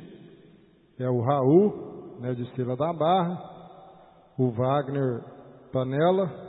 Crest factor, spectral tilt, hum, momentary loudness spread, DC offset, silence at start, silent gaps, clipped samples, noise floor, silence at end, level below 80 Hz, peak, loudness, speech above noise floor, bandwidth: 20 dB; -12 dB/octave; none; 19 LU; under 0.1%; 0 s; none; under 0.1%; -57 dBFS; 0 s; -68 dBFS; -8 dBFS; -26 LUFS; 32 dB; 4.1 kHz